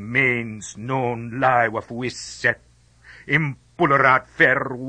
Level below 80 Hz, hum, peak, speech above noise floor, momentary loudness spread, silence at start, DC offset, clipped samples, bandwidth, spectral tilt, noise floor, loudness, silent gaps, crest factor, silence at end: -54 dBFS; none; -4 dBFS; 28 dB; 13 LU; 0 s; under 0.1%; under 0.1%; 9.8 kHz; -5.5 dB/octave; -49 dBFS; -20 LUFS; none; 18 dB; 0 s